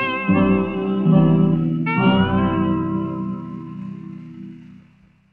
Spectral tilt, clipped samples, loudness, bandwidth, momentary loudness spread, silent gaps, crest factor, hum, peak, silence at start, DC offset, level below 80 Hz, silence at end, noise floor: -10.5 dB/octave; under 0.1%; -18 LUFS; 4.1 kHz; 20 LU; none; 16 dB; none; -4 dBFS; 0 s; under 0.1%; -44 dBFS; 0.6 s; -53 dBFS